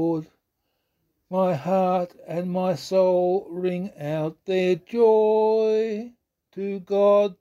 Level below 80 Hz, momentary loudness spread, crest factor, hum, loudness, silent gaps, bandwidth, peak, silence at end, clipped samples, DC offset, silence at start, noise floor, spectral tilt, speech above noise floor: -68 dBFS; 12 LU; 14 dB; none; -23 LUFS; none; 12.5 kHz; -10 dBFS; 0.05 s; under 0.1%; under 0.1%; 0 s; -76 dBFS; -7.5 dB/octave; 54 dB